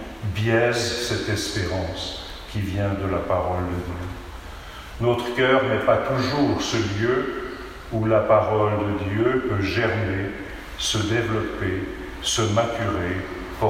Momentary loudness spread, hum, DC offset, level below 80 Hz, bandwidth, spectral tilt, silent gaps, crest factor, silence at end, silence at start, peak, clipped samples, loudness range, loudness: 13 LU; none; under 0.1%; -42 dBFS; 16 kHz; -5 dB/octave; none; 18 dB; 0 s; 0 s; -4 dBFS; under 0.1%; 5 LU; -23 LUFS